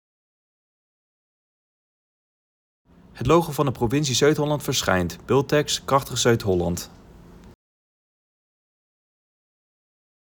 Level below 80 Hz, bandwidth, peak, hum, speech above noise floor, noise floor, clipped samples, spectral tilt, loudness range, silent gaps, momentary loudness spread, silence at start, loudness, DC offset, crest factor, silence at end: -50 dBFS; over 20 kHz; -6 dBFS; none; 25 dB; -46 dBFS; under 0.1%; -4.5 dB/octave; 8 LU; none; 6 LU; 3.15 s; -22 LUFS; under 0.1%; 20 dB; 2.85 s